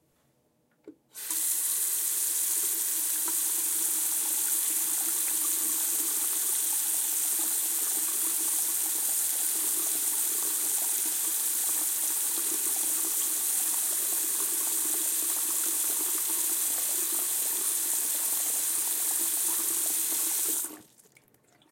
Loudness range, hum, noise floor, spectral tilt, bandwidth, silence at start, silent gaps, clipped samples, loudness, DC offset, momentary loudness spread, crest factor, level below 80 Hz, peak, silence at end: 1 LU; none; -70 dBFS; 2 dB/octave; 16.5 kHz; 0.85 s; none; under 0.1%; -25 LUFS; under 0.1%; 1 LU; 18 dB; -88 dBFS; -10 dBFS; 0.9 s